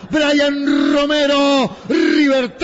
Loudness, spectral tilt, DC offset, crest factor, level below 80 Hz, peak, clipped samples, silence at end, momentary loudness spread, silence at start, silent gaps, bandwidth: -15 LUFS; -4 dB/octave; under 0.1%; 10 dB; -48 dBFS; -6 dBFS; under 0.1%; 0 s; 4 LU; 0 s; none; 8 kHz